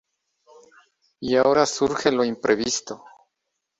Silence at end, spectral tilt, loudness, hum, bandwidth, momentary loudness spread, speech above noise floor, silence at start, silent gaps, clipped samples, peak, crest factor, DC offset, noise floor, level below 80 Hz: 0.85 s; -3.5 dB/octave; -21 LUFS; none; 8.2 kHz; 15 LU; 58 dB; 1.2 s; none; under 0.1%; -4 dBFS; 20 dB; under 0.1%; -80 dBFS; -60 dBFS